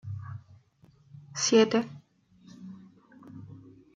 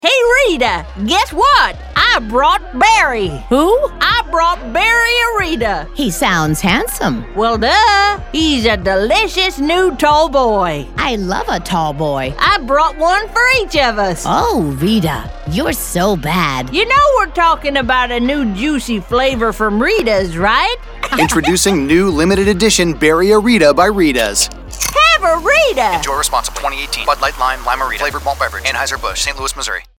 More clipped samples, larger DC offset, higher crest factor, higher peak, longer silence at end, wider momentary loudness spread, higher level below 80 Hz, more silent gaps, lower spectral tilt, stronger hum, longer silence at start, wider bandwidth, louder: neither; neither; first, 22 dB vs 14 dB; second, -10 dBFS vs 0 dBFS; first, 0.4 s vs 0.15 s; first, 27 LU vs 8 LU; second, -74 dBFS vs -30 dBFS; neither; about the same, -4 dB/octave vs -3.5 dB/octave; neither; about the same, 0.05 s vs 0.05 s; second, 9.4 kHz vs 19 kHz; second, -27 LUFS vs -13 LUFS